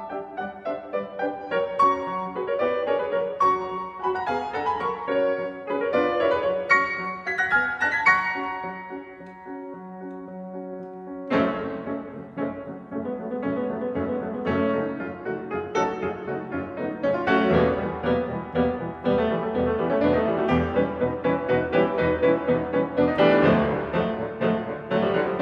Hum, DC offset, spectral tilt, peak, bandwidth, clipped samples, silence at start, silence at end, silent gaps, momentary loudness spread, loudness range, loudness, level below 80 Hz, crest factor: none; under 0.1%; -7 dB/octave; -6 dBFS; 7.4 kHz; under 0.1%; 0 s; 0 s; none; 14 LU; 8 LU; -24 LUFS; -50 dBFS; 20 dB